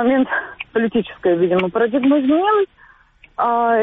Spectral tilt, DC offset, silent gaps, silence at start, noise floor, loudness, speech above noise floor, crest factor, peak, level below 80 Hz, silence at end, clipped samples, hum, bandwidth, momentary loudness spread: -4.5 dB/octave; under 0.1%; none; 0 s; -50 dBFS; -18 LUFS; 33 dB; 12 dB; -6 dBFS; -54 dBFS; 0 s; under 0.1%; none; 4 kHz; 8 LU